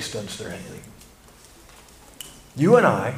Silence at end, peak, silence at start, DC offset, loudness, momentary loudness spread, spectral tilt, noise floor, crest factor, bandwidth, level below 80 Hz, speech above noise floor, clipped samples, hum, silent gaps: 0 s; -2 dBFS; 0 s; under 0.1%; -20 LUFS; 24 LU; -5.5 dB/octave; -49 dBFS; 22 dB; 15.5 kHz; -54 dBFS; 28 dB; under 0.1%; none; none